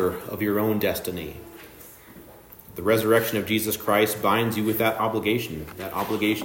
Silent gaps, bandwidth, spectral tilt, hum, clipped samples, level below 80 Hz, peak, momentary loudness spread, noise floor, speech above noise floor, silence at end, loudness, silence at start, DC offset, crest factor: none; 16.5 kHz; -5 dB/octave; none; under 0.1%; -56 dBFS; -6 dBFS; 20 LU; -47 dBFS; 23 dB; 0 s; -24 LUFS; 0 s; under 0.1%; 18 dB